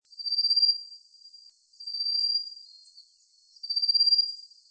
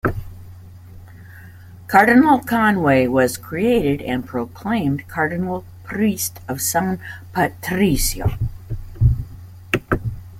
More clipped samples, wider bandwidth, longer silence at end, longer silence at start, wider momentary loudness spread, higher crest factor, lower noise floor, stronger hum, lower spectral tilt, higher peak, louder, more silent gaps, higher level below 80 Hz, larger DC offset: neither; second, 8.8 kHz vs 16.5 kHz; first, 0.25 s vs 0 s; first, 0.2 s vs 0.05 s; first, 22 LU vs 13 LU; about the same, 16 dB vs 18 dB; first, -62 dBFS vs -40 dBFS; neither; second, 8 dB/octave vs -5.5 dB/octave; second, -14 dBFS vs 0 dBFS; second, -24 LUFS vs -19 LUFS; neither; second, under -90 dBFS vs -34 dBFS; neither